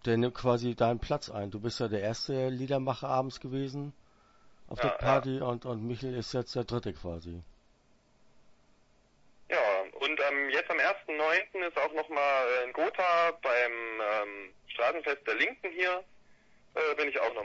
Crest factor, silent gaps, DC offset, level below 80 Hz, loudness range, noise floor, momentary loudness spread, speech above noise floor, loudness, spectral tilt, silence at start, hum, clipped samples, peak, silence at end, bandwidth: 18 dB; none; under 0.1%; -56 dBFS; 8 LU; -66 dBFS; 10 LU; 35 dB; -31 LUFS; -5.5 dB/octave; 0 s; none; under 0.1%; -14 dBFS; 0 s; 8 kHz